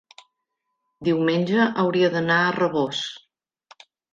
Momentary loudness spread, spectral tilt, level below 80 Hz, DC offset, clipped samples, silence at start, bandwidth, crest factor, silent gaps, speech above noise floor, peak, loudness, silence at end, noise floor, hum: 8 LU; -6 dB/octave; -68 dBFS; under 0.1%; under 0.1%; 1 s; 7.6 kHz; 16 dB; none; 58 dB; -8 dBFS; -22 LUFS; 0.95 s; -79 dBFS; none